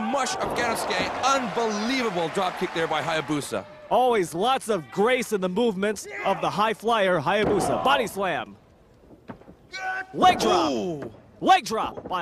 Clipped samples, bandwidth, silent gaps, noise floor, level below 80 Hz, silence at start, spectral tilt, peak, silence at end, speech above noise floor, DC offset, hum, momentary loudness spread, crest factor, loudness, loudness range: under 0.1%; 15.5 kHz; none; -54 dBFS; -56 dBFS; 0 s; -4 dB/octave; -6 dBFS; 0 s; 30 dB; under 0.1%; none; 10 LU; 18 dB; -24 LUFS; 2 LU